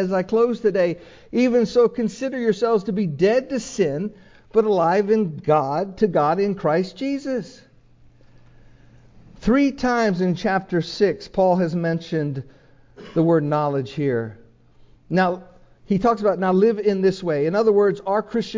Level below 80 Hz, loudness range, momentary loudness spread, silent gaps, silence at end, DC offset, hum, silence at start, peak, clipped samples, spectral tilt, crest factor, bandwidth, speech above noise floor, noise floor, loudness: -52 dBFS; 4 LU; 8 LU; none; 0 s; under 0.1%; none; 0 s; -4 dBFS; under 0.1%; -7 dB/octave; 16 dB; 7.6 kHz; 31 dB; -51 dBFS; -21 LUFS